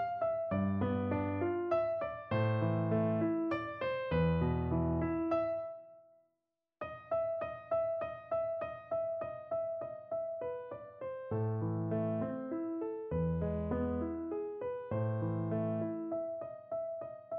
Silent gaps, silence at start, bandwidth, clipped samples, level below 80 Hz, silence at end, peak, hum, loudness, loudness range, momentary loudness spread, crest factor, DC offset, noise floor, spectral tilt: none; 0 s; 5 kHz; under 0.1%; -54 dBFS; 0 s; -22 dBFS; none; -36 LUFS; 5 LU; 9 LU; 14 dB; under 0.1%; -87 dBFS; -8 dB/octave